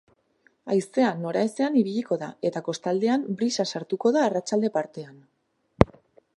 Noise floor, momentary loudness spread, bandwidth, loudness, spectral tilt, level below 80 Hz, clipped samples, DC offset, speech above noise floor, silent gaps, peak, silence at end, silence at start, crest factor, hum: -65 dBFS; 7 LU; 11.5 kHz; -25 LUFS; -6 dB/octave; -48 dBFS; under 0.1%; under 0.1%; 40 dB; none; 0 dBFS; 0.5 s; 0.65 s; 26 dB; none